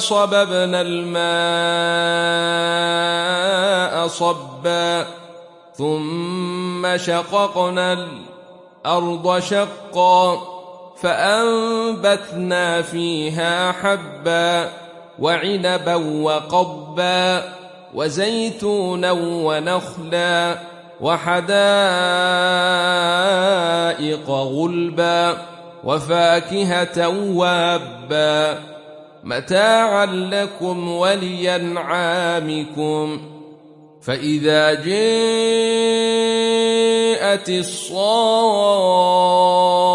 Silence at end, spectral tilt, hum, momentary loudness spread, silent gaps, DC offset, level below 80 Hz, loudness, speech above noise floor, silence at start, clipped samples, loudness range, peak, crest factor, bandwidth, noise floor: 0 s; -4 dB/octave; none; 9 LU; none; under 0.1%; -64 dBFS; -18 LUFS; 27 dB; 0 s; under 0.1%; 5 LU; -4 dBFS; 16 dB; 11.5 kHz; -45 dBFS